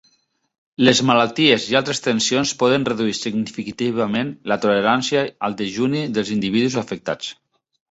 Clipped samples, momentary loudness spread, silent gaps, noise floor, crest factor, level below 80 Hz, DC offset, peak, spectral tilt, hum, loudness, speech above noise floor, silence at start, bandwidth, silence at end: under 0.1%; 10 LU; none; -64 dBFS; 18 dB; -58 dBFS; under 0.1%; -2 dBFS; -4 dB/octave; none; -19 LUFS; 44 dB; 0.8 s; 8.2 kHz; 0.6 s